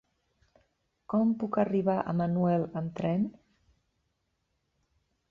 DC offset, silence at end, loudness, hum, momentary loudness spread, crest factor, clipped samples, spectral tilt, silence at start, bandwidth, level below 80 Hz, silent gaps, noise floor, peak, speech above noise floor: under 0.1%; 2 s; -29 LUFS; none; 5 LU; 18 dB; under 0.1%; -10 dB/octave; 1.1 s; 5 kHz; -66 dBFS; none; -78 dBFS; -14 dBFS; 50 dB